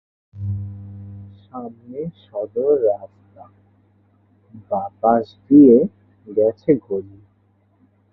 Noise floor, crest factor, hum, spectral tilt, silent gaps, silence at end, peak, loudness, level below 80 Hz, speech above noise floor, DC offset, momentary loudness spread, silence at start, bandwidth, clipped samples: -60 dBFS; 18 dB; none; -12.5 dB/octave; none; 1.1 s; -2 dBFS; -18 LUFS; -52 dBFS; 42 dB; under 0.1%; 24 LU; 0.35 s; 4.7 kHz; under 0.1%